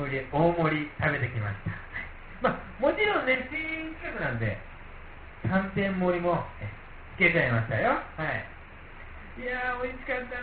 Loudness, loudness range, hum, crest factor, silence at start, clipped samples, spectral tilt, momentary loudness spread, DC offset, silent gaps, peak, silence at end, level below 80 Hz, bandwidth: -28 LUFS; 3 LU; none; 20 dB; 0 s; under 0.1%; -4.5 dB/octave; 21 LU; under 0.1%; none; -10 dBFS; 0 s; -46 dBFS; 4.8 kHz